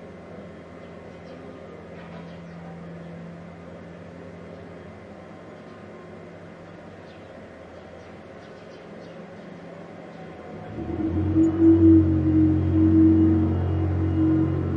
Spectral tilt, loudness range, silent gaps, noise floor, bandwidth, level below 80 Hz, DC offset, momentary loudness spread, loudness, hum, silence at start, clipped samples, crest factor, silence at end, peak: -10.5 dB/octave; 23 LU; none; -42 dBFS; 4.9 kHz; -54 dBFS; under 0.1%; 25 LU; -20 LUFS; none; 0 s; under 0.1%; 18 dB; 0 s; -6 dBFS